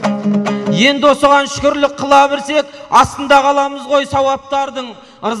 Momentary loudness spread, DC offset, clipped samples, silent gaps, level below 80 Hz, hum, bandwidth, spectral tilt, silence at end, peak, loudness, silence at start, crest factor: 9 LU; under 0.1%; under 0.1%; none; -44 dBFS; none; 13 kHz; -4.5 dB/octave; 0 s; 0 dBFS; -13 LUFS; 0 s; 12 dB